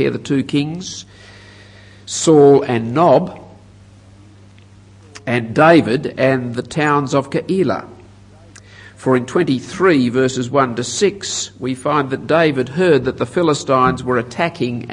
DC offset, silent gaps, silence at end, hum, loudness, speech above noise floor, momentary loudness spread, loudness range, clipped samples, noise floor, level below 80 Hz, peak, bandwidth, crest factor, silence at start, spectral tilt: under 0.1%; none; 0 s; none; -16 LUFS; 28 dB; 12 LU; 3 LU; under 0.1%; -43 dBFS; -52 dBFS; 0 dBFS; 11 kHz; 16 dB; 0 s; -5.5 dB/octave